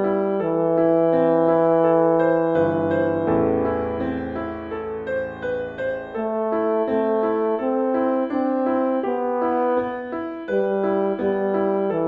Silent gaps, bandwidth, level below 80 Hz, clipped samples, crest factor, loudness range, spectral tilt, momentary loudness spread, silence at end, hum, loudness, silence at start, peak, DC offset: none; 4.7 kHz; -52 dBFS; under 0.1%; 14 dB; 6 LU; -10 dB/octave; 10 LU; 0 s; none; -21 LUFS; 0 s; -6 dBFS; under 0.1%